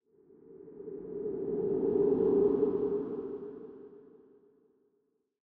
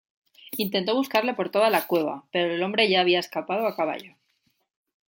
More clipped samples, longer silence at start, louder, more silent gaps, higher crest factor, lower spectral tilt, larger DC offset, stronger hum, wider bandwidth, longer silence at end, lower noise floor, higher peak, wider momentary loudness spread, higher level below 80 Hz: neither; about the same, 0.5 s vs 0.5 s; second, -31 LUFS vs -24 LUFS; neither; about the same, 16 dB vs 20 dB; first, -11 dB/octave vs -4.5 dB/octave; neither; neither; second, 2.2 kHz vs 17 kHz; first, 1.45 s vs 1 s; first, -77 dBFS vs -71 dBFS; second, -16 dBFS vs -6 dBFS; first, 24 LU vs 8 LU; first, -66 dBFS vs -76 dBFS